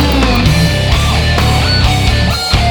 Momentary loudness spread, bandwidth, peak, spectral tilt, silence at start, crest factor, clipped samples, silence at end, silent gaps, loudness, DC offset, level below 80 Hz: 2 LU; over 20 kHz; 0 dBFS; -5 dB/octave; 0 s; 10 dB; under 0.1%; 0 s; none; -11 LUFS; under 0.1%; -16 dBFS